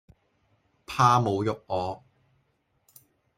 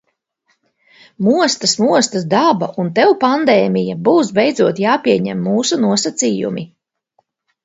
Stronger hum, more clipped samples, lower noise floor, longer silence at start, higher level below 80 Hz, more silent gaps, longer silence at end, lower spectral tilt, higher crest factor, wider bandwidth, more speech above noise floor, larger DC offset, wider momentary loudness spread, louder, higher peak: neither; neither; first, -72 dBFS vs -65 dBFS; second, 0.9 s vs 1.2 s; about the same, -62 dBFS vs -62 dBFS; neither; first, 1.4 s vs 1 s; first, -6 dB/octave vs -4.5 dB/octave; first, 22 dB vs 16 dB; first, 15.5 kHz vs 8 kHz; second, 47 dB vs 51 dB; neither; first, 15 LU vs 5 LU; second, -25 LUFS vs -14 LUFS; second, -6 dBFS vs 0 dBFS